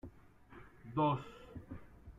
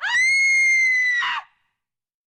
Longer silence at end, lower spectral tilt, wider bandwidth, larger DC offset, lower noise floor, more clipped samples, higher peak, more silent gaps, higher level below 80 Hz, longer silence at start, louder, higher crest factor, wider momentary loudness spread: second, 0 s vs 0.85 s; first, -8.5 dB/octave vs 4 dB/octave; second, 7.6 kHz vs 11.5 kHz; neither; second, -59 dBFS vs -81 dBFS; neither; second, -22 dBFS vs -12 dBFS; neither; about the same, -62 dBFS vs -66 dBFS; about the same, 0.05 s vs 0 s; second, -37 LUFS vs -16 LUFS; first, 18 dB vs 8 dB; first, 24 LU vs 9 LU